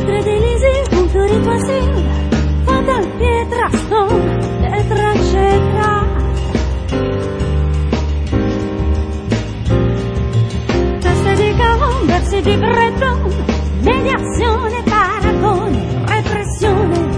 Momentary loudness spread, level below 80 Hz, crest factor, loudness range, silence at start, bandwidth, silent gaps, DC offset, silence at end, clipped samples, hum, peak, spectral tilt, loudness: 5 LU; -20 dBFS; 12 dB; 3 LU; 0 s; 10.5 kHz; none; under 0.1%; 0 s; under 0.1%; none; 0 dBFS; -6.5 dB/octave; -15 LUFS